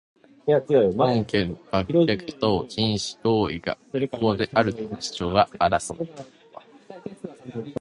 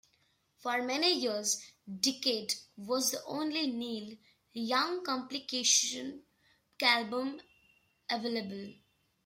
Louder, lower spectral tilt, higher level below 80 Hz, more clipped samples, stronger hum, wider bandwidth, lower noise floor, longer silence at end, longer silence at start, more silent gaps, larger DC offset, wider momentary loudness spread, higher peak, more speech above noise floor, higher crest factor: first, -24 LUFS vs -32 LUFS; first, -5.5 dB/octave vs -1 dB/octave; first, -50 dBFS vs -80 dBFS; neither; neither; second, 11.5 kHz vs 16 kHz; second, -47 dBFS vs -73 dBFS; second, 0.05 s vs 0.5 s; second, 0.45 s vs 0.6 s; neither; neither; about the same, 16 LU vs 17 LU; first, -4 dBFS vs -12 dBFS; second, 24 dB vs 40 dB; about the same, 20 dB vs 22 dB